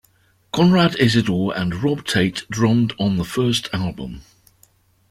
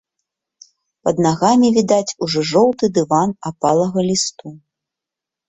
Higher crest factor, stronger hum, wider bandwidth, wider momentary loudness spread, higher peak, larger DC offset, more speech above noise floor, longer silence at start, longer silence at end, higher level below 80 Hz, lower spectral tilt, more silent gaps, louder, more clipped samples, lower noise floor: about the same, 18 dB vs 16 dB; neither; first, 15.5 kHz vs 8.4 kHz; first, 12 LU vs 8 LU; about the same, -2 dBFS vs -2 dBFS; neither; second, 40 dB vs 69 dB; second, 0.55 s vs 1.05 s; about the same, 0.9 s vs 0.9 s; first, -48 dBFS vs -56 dBFS; about the same, -5.5 dB/octave vs -5 dB/octave; neither; second, -19 LUFS vs -16 LUFS; neither; second, -59 dBFS vs -85 dBFS